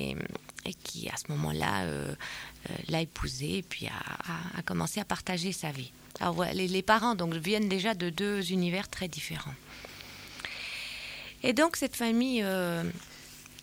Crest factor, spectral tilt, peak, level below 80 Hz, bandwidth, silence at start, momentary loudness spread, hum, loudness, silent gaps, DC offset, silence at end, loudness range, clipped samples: 22 dB; -4.5 dB/octave; -10 dBFS; -54 dBFS; 17 kHz; 0 s; 14 LU; none; -32 LUFS; none; under 0.1%; 0 s; 5 LU; under 0.1%